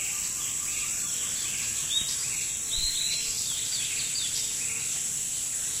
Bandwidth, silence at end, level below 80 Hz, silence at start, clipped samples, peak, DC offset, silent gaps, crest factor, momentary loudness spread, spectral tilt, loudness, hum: 16 kHz; 0 s; -52 dBFS; 0 s; under 0.1%; -14 dBFS; under 0.1%; none; 16 dB; 2 LU; 1 dB/octave; -27 LUFS; none